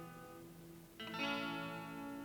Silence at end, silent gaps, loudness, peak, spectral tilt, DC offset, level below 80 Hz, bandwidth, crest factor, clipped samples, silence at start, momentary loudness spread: 0 s; none; -44 LUFS; -28 dBFS; -4.5 dB/octave; under 0.1%; -72 dBFS; over 20 kHz; 18 dB; under 0.1%; 0 s; 16 LU